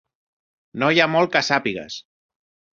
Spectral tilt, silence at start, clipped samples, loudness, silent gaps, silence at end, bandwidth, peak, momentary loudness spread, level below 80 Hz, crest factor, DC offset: -4.5 dB/octave; 0.75 s; under 0.1%; -19 LUFS; none; 0.7 s; 7.8 kHz; -2 dBFS; 18 LU; -62 dBFS; 22 dB; under 0.1%